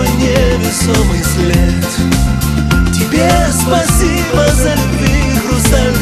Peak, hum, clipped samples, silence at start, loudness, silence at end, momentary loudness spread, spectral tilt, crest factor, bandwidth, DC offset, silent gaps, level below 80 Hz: 0 dBFS; none; under 0.1%; 0 s; -12 LUFS; 0 s; 2 LU; -5 dB/octave; 10 dB; 14.5 kHz; under 0.1%; none; -16 dBFS